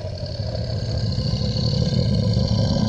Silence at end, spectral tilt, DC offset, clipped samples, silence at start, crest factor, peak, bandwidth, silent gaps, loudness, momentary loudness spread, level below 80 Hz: 0 s; -7 dB/octave; under 0.1%; under 0.1%; 0 s; 14 dB; -8 dBFS; 8.2 kHz; none; -22 LUFS; 7 LU; -32 dBFS